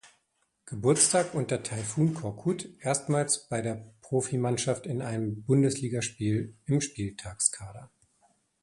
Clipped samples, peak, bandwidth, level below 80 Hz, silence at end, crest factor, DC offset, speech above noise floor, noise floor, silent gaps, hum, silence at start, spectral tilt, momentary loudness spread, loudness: under 0.1%; -8 dBFS; 11.5 kHz; -60 dBFS; 0.75 s; 22 dB; under 0.1%; 46 dB; -75 dBFS; none; none; 0.05 s; -4.5 dB/octave; 10 LU; -29 LUFS